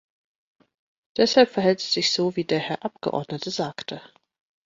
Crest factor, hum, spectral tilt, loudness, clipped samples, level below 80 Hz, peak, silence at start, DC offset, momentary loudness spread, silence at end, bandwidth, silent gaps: 20 dB; none; -4 dB/octave; -23 LUFS; under 0.1%; -66 dBFS; -4 dBFS; 1.15 s; under 0.1%; 15 LU; 0.65 s; 7.8 kHz; none